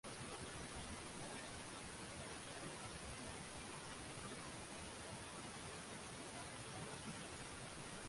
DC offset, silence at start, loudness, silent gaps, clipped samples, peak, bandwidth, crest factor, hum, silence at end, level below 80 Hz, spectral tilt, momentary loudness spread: under 0.1%; 0.05 s; -51 LUFS; none; under 0.1%; -38 dBFS; 11.5 kHz; 14 dB; none; 0 s; -66 dBFS; -3 dB/octave; 1 LU